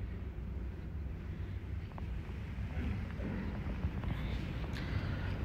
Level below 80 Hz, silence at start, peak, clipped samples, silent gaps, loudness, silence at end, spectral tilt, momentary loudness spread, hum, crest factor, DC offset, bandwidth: -42 dBFS; 0 s; -24 dBFS; under 0.1%; none; -41 LUFS; 0 s; -8 dB/octave; 5 LU; none; 14 dB; under 0.1%; 8 kHz